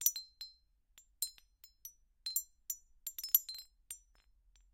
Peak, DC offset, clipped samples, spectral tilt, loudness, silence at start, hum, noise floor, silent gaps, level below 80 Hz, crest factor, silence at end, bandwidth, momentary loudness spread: -12 dBFS; under 0.1%; under 0.1%; 4 dB/octave; -37 LUFS; 0 s; none; -69 dBFS; none; -72 dBFS; 32 dB; 0.75 s; 16.5 kHz; 21 LU